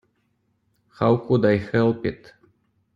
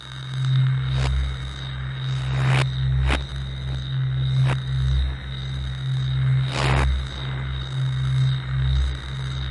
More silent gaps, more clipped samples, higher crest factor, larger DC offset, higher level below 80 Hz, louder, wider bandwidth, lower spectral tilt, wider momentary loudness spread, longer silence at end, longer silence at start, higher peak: neither; neither; about the same, 18 dB vs 16 dB; neither; second, -56 dBFS vs -30 dBFS; first, -21 LUFS vs -24 LUFS; second, 7.2 kHz vs 11 kHz; first, -9 dB/octave vs -6.5 dB/octave; about the same, 10 LU vs 9 LU; first, 0.8 s vs 0 s; first, 1 s vs 0 s; about the same, -6 dBFS vs -6 dBFS